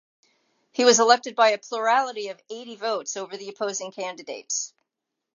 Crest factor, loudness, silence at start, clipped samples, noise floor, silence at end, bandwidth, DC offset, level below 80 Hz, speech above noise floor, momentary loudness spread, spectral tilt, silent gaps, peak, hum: 22 dB; -23 LUFS; 0.75 s; under 0.1%; -84 dBFS; 0.65 s; 7.6 kHz; under 0.1%; -88 dBFS; 60 dB; 18 LU; -1 dB/octave; none; -2 dBFS; none